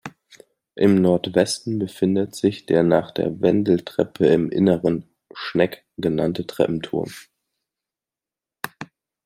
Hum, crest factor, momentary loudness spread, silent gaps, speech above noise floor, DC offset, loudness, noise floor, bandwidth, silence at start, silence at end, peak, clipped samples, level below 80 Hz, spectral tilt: none; 20 dB; 16 LU; none; 70 dB; under 0.1%; -21 LUFS; -90 dBFS; 16 kHz; 0.05 s; 0.4 s; -2 dBFS; under 0.1%; -58 dBFS; -6.5 dB/octave